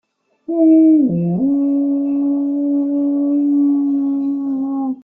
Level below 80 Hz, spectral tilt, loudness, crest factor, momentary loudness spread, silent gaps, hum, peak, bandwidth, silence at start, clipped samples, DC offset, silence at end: -64 dBFS; -13.5 dB/octave; -16 LUFS; 12 dB; 9 LU; none; none; -4 dBFS; 2.4 kHz; 0.5 s; under 0.1%; under 0.1%; 0.05 s